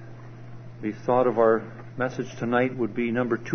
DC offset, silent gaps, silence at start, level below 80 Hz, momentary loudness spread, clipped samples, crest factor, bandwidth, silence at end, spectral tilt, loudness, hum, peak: under 0.1%; none; 0 s; -56 dBFS; 22 LU; under 0.1%; 18 dB; 6.6 kHz; 0 s; -7.5 dB/octave; -25 LUFS; none; -8 dBFS